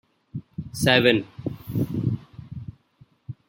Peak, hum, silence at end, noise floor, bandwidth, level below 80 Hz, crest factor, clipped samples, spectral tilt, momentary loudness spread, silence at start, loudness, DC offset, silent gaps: -2 dBFS; none; 0.15 s; -58 dBFS; 16.5 kHz; -52 dBFS; 24 dB; under 0.1%; -5 dB/octave; 22 LU; 0.35 s; -23 LUFS; under 0.1%; none